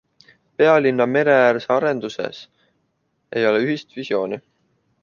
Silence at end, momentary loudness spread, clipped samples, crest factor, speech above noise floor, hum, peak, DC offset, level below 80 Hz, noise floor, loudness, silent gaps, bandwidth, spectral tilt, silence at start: 0.65 s; 15 LU; under 0.1%; 18 dB; 51 dB; none; -2 dBFS; under 0.1%; -68 dBFS; -70 dBFS; -19 LUFS; none; 7.2 kHz; -6.5 dB/octave; 0.6 s